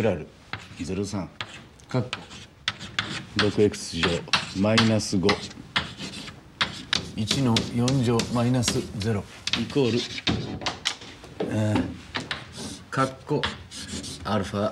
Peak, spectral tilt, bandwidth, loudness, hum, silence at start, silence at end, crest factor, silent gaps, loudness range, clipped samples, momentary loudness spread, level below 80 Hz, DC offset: -6 dBFS; -4.5 dB/octave; 14 kHz; -26 LUFS; none; 0 s; 0 s; 22 dB; none; 5 LU; under 0.1%; 13 LU; -52 dBFS; under 0.1%